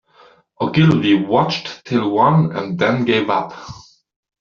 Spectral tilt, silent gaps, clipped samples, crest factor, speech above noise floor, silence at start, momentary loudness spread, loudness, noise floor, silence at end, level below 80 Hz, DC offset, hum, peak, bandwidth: -5.5 dB/octave; none; under 0.1%; 16 dB; 34 dB; 0.6 s; 11 LU; -17 LUFS; -50 dBFS; 0.6 s; -52 dBFS; under 0.1%; none; -2 dBFS; 7 kHz